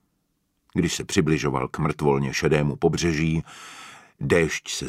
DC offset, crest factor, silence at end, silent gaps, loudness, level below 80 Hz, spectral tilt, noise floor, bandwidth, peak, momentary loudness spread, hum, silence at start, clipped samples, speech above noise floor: under 0.1%; 18 dB; 0 s; none; -23 LUFS; -44 dBFS; -5 dB/octave; -72 dBFS; 15 kHz; -6 dBFS; 18 LU; none; 0.75 s; under 0.1%; 49 dB